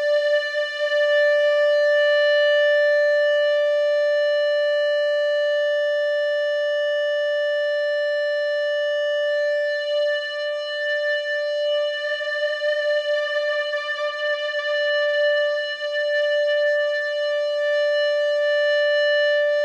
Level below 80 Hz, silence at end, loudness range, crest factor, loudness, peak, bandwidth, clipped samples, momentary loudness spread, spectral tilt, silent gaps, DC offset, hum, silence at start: -90 dBFS; 0 s; 5 LU; 10 dB; -21 LUFS; -10 dBFS; 8 kHz; under 0.1%; 6 LU; 2.5 dB/octave; none; under 0.1%; none; 0 s